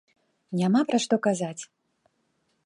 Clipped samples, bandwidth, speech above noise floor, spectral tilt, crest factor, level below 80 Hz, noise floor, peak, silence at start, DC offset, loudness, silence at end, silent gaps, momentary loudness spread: under 0.1%; 11.5 kHz; 48 dB; -5.5 dB/octave; 18 dB; -78 dBFS; -73 dBFS; -10 dBFS; 0.5 s; under 0.1%; -25 LUFS; 1 s; none; 15 LU